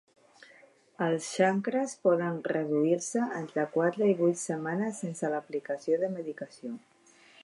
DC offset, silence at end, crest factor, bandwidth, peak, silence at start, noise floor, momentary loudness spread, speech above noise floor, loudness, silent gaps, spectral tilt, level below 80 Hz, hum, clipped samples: under 0.1%; 0.65 s; 18 dB; 11.5 kHz; -12 dBFS; 1 s; -60 dBFS; 11 LU; 30 dB; -30 LUFS; none; -5.5 dB/octave; -84 dBFS; none; under 0.1%